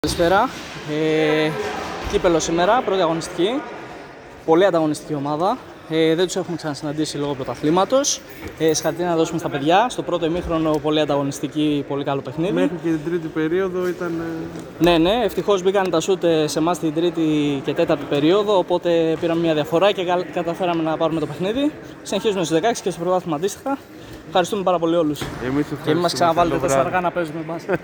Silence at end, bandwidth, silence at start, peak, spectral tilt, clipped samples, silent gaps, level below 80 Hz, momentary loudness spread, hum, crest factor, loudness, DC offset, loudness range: 0 s; over 20 kHz; 0.05 s; -2 dBFS; -5 dB/octave; under 0.1%; none; -46 dBFS; 9 LU; none; 18 dB; -20 LUFS; under 0.1%; 3 LU